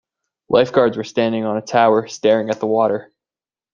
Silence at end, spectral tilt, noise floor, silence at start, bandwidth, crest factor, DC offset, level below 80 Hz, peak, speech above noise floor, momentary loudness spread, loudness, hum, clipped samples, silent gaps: 0.7 s; -5.5 dB/octave; under -90 dBFS; 0.5 s; 7.4 kHz; 16 dB; under 0.1%; -60 dBFS; -2 dBFS; over 73 dB; 5 LU; -17 LUFS; none; under 0.1%; none